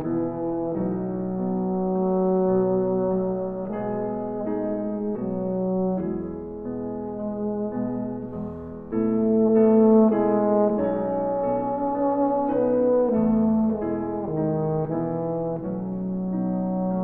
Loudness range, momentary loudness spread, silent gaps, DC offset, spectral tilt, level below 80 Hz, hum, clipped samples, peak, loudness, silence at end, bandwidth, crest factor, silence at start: 7 LU; 10 LU; none; under 0.1%; -13.5 dB/octave; -52 dBFS; none; under 0.1%; -8 dBFS; -24 LUFS; 0 s; 2.9 kHz; 16 dB; 0 s